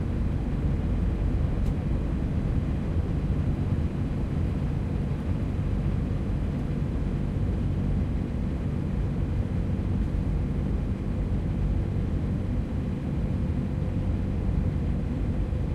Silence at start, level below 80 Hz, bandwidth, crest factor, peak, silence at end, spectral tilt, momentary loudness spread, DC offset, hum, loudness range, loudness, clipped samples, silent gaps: 0 s; -30 dBFS; 8.6 kHz; 12 dB; -14 dBFS; 0 s; -9.5 dB/octave; 2 LU; under 0.1%; none; 1 LU; -29 LUFS; under 0.1%; none